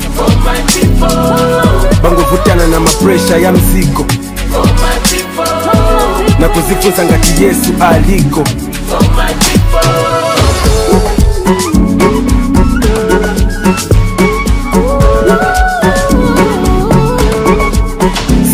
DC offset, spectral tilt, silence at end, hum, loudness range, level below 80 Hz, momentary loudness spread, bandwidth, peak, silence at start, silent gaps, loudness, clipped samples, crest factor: under 0.1%; -5 dB/octave; 0 s; none; 1 LU; -14 dBFS; 4 LU; 16 kHz; 0 dBFS; 0 s; none; -9 LUFS; 2%; 8 dB